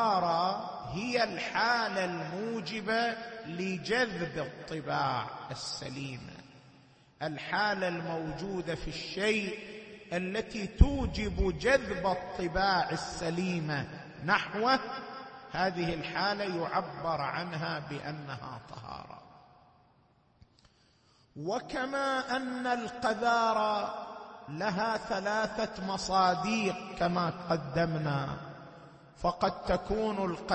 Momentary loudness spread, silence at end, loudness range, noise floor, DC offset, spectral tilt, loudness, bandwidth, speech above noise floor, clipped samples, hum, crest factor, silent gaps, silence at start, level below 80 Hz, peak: 14 LU; 0 s; 7 LU; -66 dBFS; under 0.1%; -5 dB/octave; -32 LUFS; 8.4 kHz; 34 dB; under 0.1%; none; 26 dB; none; 0 s; -44 dBFS; -8 dBFS